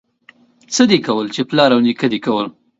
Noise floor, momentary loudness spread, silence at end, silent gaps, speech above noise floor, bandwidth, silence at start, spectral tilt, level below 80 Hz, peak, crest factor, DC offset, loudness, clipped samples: -50 dBFS; 7 LU; 0.3 s; none; 35 dB; 8 kHz; 0.7 s; -4.5 dB/octave; -62 dBFS; 0 dBFS; 16 dB; under 0.1%; -15 LUFS; under 0.1%